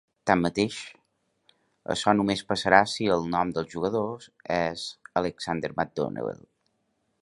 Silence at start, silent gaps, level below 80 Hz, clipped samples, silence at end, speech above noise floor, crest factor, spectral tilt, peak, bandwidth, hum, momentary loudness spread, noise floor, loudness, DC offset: 0.25 s; none; -58 dBFS; under 0.1%; 0.9 s; 48 dB; 26 dB; -5 dB/octave; -2 dBFS; 11.5 kHz; none; 15 LU; -74 dBFS; -27 LUFS; under 0.1%